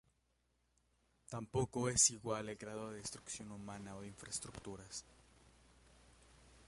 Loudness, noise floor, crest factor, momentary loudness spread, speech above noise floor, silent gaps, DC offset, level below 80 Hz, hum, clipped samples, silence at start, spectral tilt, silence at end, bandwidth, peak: -40 LUFS; -80 dBFS; 28 dB; 19 LU; 38 dB; none; under 0.1%; -66 dBFS; none; under 0.1%; 1.3 s; -3 dB/octave; 0 s; 11.5 kHz; -16 dBFS